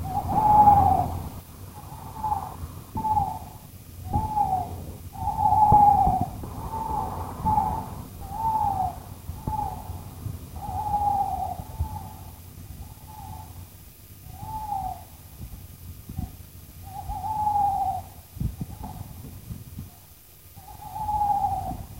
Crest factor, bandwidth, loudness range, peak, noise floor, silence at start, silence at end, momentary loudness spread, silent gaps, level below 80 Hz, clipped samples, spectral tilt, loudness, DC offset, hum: 22 dB; 16 kHz; 15 LU; -4 dBFS; -50 dBFS; 0 s; 0 s; 23 LU; none; -42 dBFS; under 0.1%; -7 dB/octave; -25 LUFS; under 0.1%; none